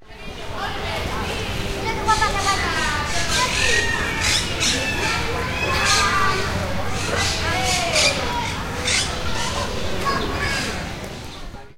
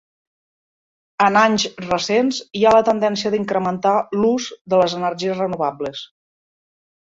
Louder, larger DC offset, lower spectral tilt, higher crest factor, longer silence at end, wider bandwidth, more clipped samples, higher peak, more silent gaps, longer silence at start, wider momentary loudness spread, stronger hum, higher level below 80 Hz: about the same, -20 LUFS vs -18 LUFS; neither; second, -2.5 dB/octave vs -4.5 dB/octave; about the same, 18 dB vs 18 dB; second, 0 s vs 1 s; first, 16 kHz vs 7.8 kHz; neither; about the same, -4 dBFS vs -2 dBFS; second, none vs 4.61-4.65 s; second, 0 s vs 1.2 s; about the same, 10 LU vs 9 LU; neither; first, -34 dBFS vs -58 dBFS